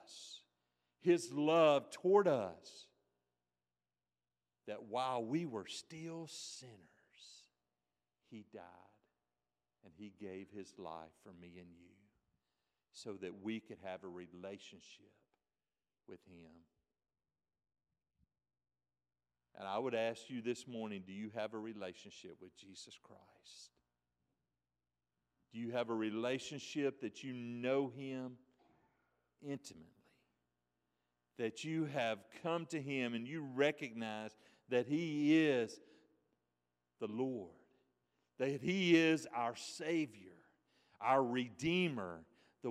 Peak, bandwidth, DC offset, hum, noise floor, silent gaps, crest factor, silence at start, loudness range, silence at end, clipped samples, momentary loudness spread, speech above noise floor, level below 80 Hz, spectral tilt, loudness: -18 dBFS; 12.5 kHz; under 0.1%; 60 Hz at -80 dBFS; under -90 dBFS; none; 24 dB; 0.1 s; 19 LU; 0 s; under 0.1%; 24 LU; over 50 dB; -84 dBFS; -5.5 dB/octave; -39 LUFS